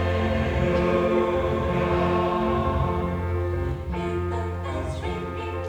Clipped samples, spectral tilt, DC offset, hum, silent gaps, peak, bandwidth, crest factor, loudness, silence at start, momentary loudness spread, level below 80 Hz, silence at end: under 0.1%; -8 dB/octave; under 0.1%; none; none; -10 dBFS; 9.2 kHz; 14 dB; -25 LUFS; 0 s; 8 LU; -34 dBFS; 0 s